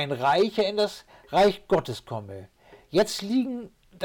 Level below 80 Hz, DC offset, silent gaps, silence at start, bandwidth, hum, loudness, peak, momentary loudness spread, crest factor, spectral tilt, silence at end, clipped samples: -56 dBFS; under 0.1%; none; 0 s; 18 kHz; none; -25 LUFS; -14 dBFS; 15 LU; 12 dB; -5 dB/octave; 0 s; under 0.1%